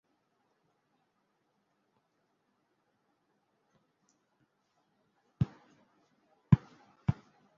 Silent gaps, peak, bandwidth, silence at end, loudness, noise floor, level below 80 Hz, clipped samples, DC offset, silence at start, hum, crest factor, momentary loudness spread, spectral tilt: none; -8 dBFS; 6.6 kHz; 0.45 s; -33 LUFS; -78 dBFS; -58 dBFS; under 0.1%; under 0.1%; 5.4 s; none; 32 dB; 8 LU; -10 dB/octave